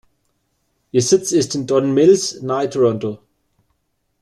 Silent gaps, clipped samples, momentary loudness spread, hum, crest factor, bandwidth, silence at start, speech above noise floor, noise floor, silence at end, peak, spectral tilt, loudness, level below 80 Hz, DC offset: none; under 0.1%; 10 LU; none; 16 dB; 12.5 kHz; 0.95 s; 53 dB; -69 dBFS; 1.05 s; -2 dBFS; -5 dB/octave; -17 LUFS; -58 dBFS; under 0.1%